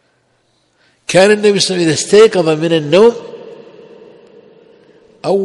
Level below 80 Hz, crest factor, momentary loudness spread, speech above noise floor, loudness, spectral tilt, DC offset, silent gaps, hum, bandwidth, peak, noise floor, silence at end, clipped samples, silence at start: -56 dBFS; 14 dB; 20 LU; 49 dB; -11 LUFS; -4 dB/octave; under 0.1%; none; none; 11.5 kHz; 0 dBFS; -58 dBFS; 0 s; under 0.1%; 1.1 s